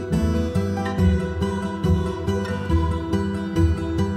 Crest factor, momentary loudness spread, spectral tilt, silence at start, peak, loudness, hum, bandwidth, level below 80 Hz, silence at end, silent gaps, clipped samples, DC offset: 14 dB; 4 LU; -7.5 dB/octave; 0 s; -8 dBFS; -23 LUFS; none; 12.5 kHz; -30 dBFS; 0 s; none; under 0.1%; under 0.1%